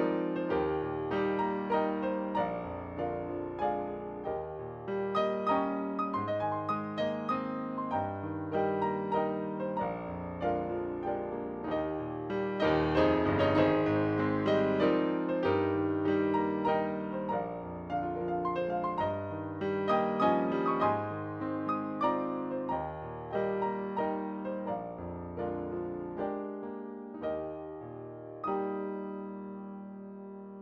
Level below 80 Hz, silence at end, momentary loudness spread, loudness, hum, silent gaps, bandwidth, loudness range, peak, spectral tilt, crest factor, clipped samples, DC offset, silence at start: -58 dBFS; 0 s; 12 LU; -33 LUFS; none; none; 6.8 kHz; 9 LU; -14 dBFS; -8.5 dB/octave; 18 dB; under 0.1%; under 0.1%; 0 s